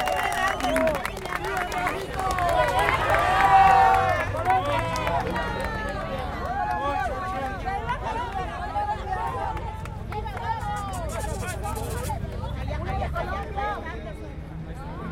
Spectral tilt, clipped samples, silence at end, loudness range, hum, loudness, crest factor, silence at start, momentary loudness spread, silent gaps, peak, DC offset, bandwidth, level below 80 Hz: -5 dB/octave; under 0.1%; 0 s; 10 LU; none; -25 LUFS; 20 dB; 0 s; 13 LU; none; -6 dBFS; under 0.1%; 17 kHz; -36 dBFS